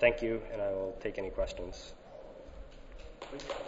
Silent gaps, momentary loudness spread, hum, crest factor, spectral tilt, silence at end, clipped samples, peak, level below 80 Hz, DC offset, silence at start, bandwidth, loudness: none; 17 LU; none; 26 dB; -3.5 dB/octave; 0 s; under 0.1%; -10 dBFS; -48 dBFS; under 0.1%; 0 s; 7.6 kHz; -37 LUFS